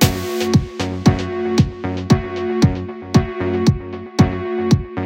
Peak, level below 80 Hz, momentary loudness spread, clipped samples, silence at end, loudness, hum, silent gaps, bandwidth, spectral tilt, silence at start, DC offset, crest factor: 0 dBFS; -34 dBFS; 6 LU; under 0.1%; 0 s; -18 LUFS; none; none; 16.5 kHz; -6 dB/octave; 0 s; under 0.1%; 18 dB